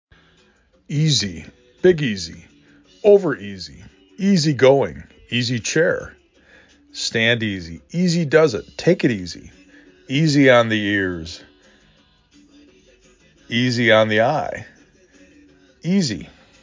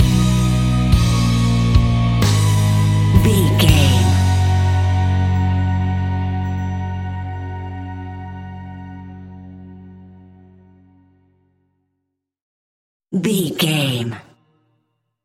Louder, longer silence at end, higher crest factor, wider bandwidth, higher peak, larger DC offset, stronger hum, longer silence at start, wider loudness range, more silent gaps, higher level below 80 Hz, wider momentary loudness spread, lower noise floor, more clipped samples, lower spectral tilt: about the same, -18 LUFS vs -17 LUFS; second, 0.35 s vs 1.05 s; about the same, 20 dB vs 18 dB; second, 7.6 kHz vs 16.5 kHz; about the same, 0 dBFS vs 0 dBFS; neither; neither; first, 0.9 s vs 0 s; second, 3 LU vs 19 LU; second, none vs 12.42-13.00 s; second, -50 dBFS vs -28 dBFS; about the same, 18 LU vs 20 LU; second, -57 dBFS vs -76 dBFS; neither; about the same, -5 dB/octave vs -6 dB/octave